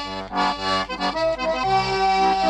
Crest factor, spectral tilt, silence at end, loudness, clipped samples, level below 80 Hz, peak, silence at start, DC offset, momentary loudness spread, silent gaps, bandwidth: 12 dB; -4 dB/octave; 0 s; -22 LUFS; under 0.1%; -44 dBFS; -10 dBFS; 0 s; under 0.1%; 5 LU; none; 10.5 kHz